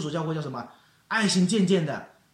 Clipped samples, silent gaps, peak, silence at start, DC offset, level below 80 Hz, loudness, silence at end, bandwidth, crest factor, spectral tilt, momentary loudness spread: under 0.1%; none; -10 dBFS; 0 s; under 0.1%; -68 dBFS; -25 LUFS; 0.3 s; 11 kHz; 16 dB; -5 dB/octave; 15 LU